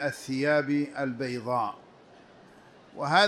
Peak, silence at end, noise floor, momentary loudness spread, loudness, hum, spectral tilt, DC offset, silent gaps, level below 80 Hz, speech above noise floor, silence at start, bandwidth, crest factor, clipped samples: -8 dBFS; 0 s; -54 dBFS; 10 LU; -29 LUFS; none; -5 dB/octave; under 0.1%; none; -72 dBFS; 27 dB; 0 s; 13.5 kHz; 20 dB; under 0.1%